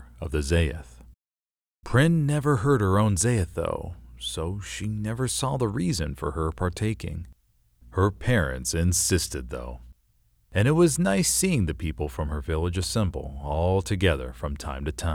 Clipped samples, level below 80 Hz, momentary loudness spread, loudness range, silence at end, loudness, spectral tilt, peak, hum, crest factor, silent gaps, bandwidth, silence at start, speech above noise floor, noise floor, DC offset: under 0.1%; -38 dBFS; 12 LU; 4 LU; 0 s; -25 LUFS; -5 dB/octave; -6 dBFS; none; 18 dB; none; 17 kHz; 0 s; over 65 dB; under -90 dBFS; under 0.1%